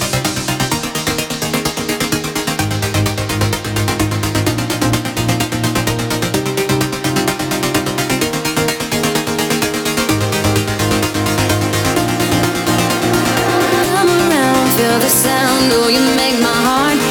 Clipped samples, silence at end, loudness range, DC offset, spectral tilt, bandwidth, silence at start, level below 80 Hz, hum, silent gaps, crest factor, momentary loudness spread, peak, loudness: under 0.1%; 0 s; 5 LU; under 0.1%; -4 dB/octave; 19 kHz; 0 s; -36 dBFS; none; none; 14 dB; 6 LU; -2 dBFS; -15 LUFS